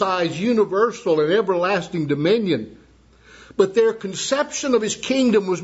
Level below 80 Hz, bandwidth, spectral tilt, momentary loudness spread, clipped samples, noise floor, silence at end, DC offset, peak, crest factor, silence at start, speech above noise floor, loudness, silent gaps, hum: -58 dBFS; 8 kHz; -4.5 dB/octave; 6 LU; under 0.1%; -51 dBFS; 0 s; under 0.1%; -2 dBFS; 18 dB; 0 s; 32 dB; -20 LUFS; none; none